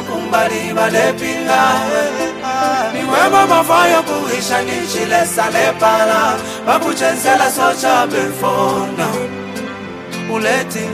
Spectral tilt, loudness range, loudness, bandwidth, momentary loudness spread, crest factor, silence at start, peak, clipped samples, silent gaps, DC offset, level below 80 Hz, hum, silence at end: -3.5 dB/octave; 3 LU; -14 LUFS; 15.5 kHz; 9 LU; 14 dB; 0 s; 0 dBFS; under 0.1%; none; under 0.1%; -54 dBFS; none; 0 s